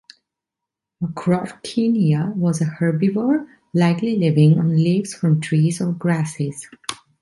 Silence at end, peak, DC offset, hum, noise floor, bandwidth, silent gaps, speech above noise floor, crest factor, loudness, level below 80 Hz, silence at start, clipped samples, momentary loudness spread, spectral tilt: 0.25 s; -6 dBFS; under 0.1%; none; -85 dBFS; 11.5 kHz; none; 66 dB; 14 dB; -19 LUFS; -62 dBFS; 1 s; under 0.1%; 12 LU; -7 dB/octave